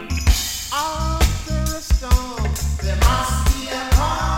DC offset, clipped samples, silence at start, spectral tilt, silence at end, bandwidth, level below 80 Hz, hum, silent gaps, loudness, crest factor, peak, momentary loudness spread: under 0.1%; under 0.1%; 0 s; -4 dB/octave; 0 s; 16.5 kHz; -20 dBFS; none; none; -20 LUFS; 16 dB; -2 dBFS; 5 LU